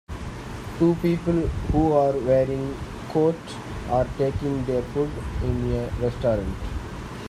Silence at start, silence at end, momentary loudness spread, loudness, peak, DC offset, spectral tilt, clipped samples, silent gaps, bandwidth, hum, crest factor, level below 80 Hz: 0.1 s; 0 s; 14 LU; -24 LUFS; -8 dBFS; under 0.1%; -8 dB/octave; under 0.1%; none; 14 kHz; none; 16 dB; -36 dBFS